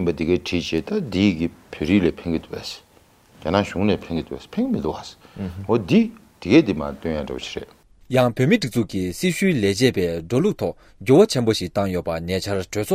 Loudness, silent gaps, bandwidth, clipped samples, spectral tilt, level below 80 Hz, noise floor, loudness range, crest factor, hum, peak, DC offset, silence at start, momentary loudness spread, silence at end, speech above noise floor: -21 LUFS; none; 16 kHz; under 0.1%; -6 dB/octave; -48 dBFS; -54 dBFS; 4 LU; 18 dB; none; -2 dBFS; under 0.1%; 0 s; 14 LU; 0 s; 33 dB